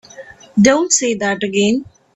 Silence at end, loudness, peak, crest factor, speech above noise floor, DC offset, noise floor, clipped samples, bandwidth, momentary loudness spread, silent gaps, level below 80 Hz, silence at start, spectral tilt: 0.3 s; -15 LUFS; 0 dBFS; 16 dB; 24 dB; under 0.1%; -38 dBFS; under 0.1%; 8.4 kHz; 8 LU; none; -52 dBFS; 0.2 s; -3.5 dB/octave